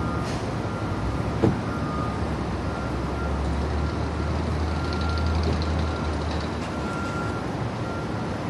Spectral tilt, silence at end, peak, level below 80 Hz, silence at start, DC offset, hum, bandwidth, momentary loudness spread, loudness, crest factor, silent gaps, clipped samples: -7 dB/octave; 0 s; -4 dBFS; -32 dBFS; 0 s; under 0.1%; none; 11.5 kHz; 4 LU; -27 LUFS; 22 dB; none; under 0.1%